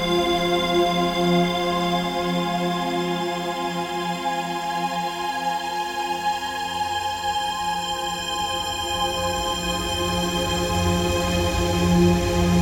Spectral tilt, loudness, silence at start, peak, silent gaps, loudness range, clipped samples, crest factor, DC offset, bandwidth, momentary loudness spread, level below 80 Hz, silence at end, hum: -4.5 dB/octave; -23 LUFS; 0 s; -6 dBFS; none; 4 LU; under 0.1%; 16 dB; under 0.1%; 17 kHz; 6 LU; -38 dBFS; 0 s; none